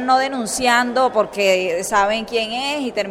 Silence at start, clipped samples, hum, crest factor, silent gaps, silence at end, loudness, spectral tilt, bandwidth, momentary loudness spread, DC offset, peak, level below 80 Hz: 0 s; under 0.1%; none; 16 dB; none; 0 s; -18 LUFS; -2.5 dB/octave; 16 kHz; 6 LU; under 0.1%; -2 dBFS; -50 dBFS